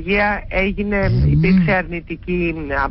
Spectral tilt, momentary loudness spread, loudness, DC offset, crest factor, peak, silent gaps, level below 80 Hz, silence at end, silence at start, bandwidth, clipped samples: -12.5 dB/octave; 8 LU; -18 LUFS; under 0.1%; 10 dB; -6 dBFS; none; -28 dBFS; 0 s; 0 s; 5.8 kHz; under 0.1%